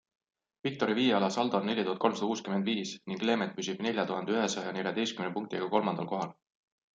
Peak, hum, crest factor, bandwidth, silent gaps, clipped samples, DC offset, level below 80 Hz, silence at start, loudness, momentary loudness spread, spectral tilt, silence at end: -12 dBFS; none; 20 dB; 9.2 kHz; none; under 0.1%; under 0.1%; -78 dBFS; 0.65 s; -31 LUFS; 7 LU; -4.5 dB/octave; 0.65 s